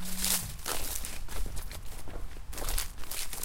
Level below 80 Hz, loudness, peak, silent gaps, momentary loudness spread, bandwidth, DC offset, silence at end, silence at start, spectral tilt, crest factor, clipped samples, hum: -38 dBFS; -35 LUFS; -10 dBFS; none; 16 LU; 17 kHz; under 0.1%; 0 s; 0 s; -1.5 dB/octave; 22 dB; under 0.1%; none